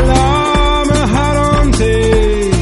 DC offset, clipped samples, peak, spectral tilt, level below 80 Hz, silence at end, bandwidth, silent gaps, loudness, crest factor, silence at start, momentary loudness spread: under 0.1%; under 0.1%; 0 dBFS; -5.5 dB/octave; -16 dBFS; 0 s; 11.5 kHz; none; -12 LUFS; 10 dB; 0 s; 1 LU